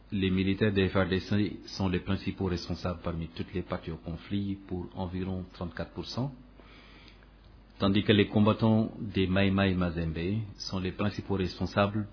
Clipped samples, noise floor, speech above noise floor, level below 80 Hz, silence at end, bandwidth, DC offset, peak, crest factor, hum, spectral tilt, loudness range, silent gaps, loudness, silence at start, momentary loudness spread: under 0.1%; -54 dBFS; 25 dB; -50 dBFS; 0 s; 5.4 kHz; under 0.1%; -10 dBFS; 20 dB; none; -7 dB/octave; 10 LU; none; -30 LUFS; 0.1 s; 12 LU